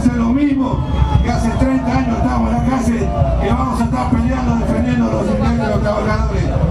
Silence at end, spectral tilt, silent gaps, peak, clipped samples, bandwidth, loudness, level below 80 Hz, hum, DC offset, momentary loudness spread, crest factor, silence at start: 0 s; -7.5 dB/octave; none; 0 dBFS; under 0.1%; 11.5 kHz; -16 LUFS; -22 dBFS; none; under 0.1%; 2 LU; 14 dB; 0 s